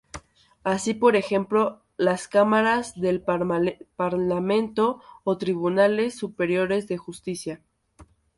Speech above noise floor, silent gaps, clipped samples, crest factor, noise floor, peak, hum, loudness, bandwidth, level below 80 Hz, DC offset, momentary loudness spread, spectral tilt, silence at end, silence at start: 31 dB; none; under 0.1%; 18 dB; -54 dBFS; -6 dBFS; none; -24 LUFS; 11.5 kHz; -58 dBFS; under 0.1%; 12 LU; -5.5 dB/octave; 0.35 s; 0.15 s